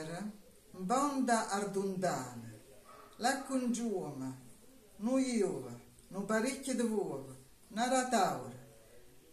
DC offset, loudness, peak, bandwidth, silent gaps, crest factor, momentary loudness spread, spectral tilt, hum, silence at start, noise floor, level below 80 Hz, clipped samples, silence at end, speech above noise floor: under 0.1%; -35 LUFS; -18 dBFS; 14.5 kHz; none; 18 dB; 21 LU; -4.5 dB/octave; none; 0 s; -59 dBFS; -68 dBFS; under 0.1%; 0 s; 25 dB